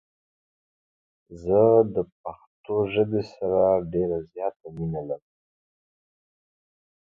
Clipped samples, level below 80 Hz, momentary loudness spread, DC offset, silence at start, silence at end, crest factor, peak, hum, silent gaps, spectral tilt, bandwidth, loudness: under 0.1%; -54 dBFS; 17 LU; under 0.1%; 1.3 s; 1.85 s; 20 dB; -6 dBFS; none; 2.12-2.24 s, 2.47-2.64 s, 4.56-4.60 s; -9.5 dB/octave; 6.6 kHz; -24 LUFS